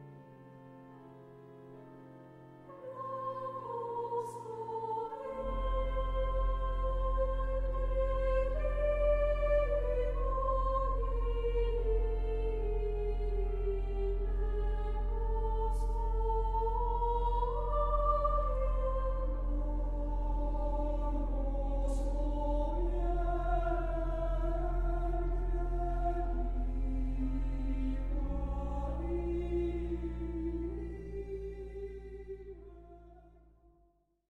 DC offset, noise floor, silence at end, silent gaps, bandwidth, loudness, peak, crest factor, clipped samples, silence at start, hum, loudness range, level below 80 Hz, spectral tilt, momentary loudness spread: under 0.1%; -71 dBFS; 1.2 s; none; 4 kHz; -36 LUFS; -20 dBFS; 14 dB; under 0.1%; 0 s; none; 9 LU; -34 dBFS; -8.5 dB/octave; 14 LU